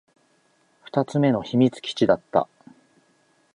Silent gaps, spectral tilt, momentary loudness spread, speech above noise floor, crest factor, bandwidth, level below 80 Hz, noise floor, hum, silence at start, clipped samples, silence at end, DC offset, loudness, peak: none; -7 dB/octave; 6 LU; 43 dB; 20 dB; 10.5 kHz; -62 dBFS; -64 dBFS; none; 0.95 s; under 0.1%; 1.1 s; under 0.1%; -23 LUFS; -4 dBFS